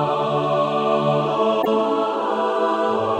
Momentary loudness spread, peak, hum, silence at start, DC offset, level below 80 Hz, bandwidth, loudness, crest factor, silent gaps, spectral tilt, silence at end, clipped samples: 2 LU; -8 dBFS; none; 0 s; under 0.1%; -66 dBFS; 16 kHz; -20 LUFS; 12 dB; none; -6.5 dB/octave; 0 s; under 0.1%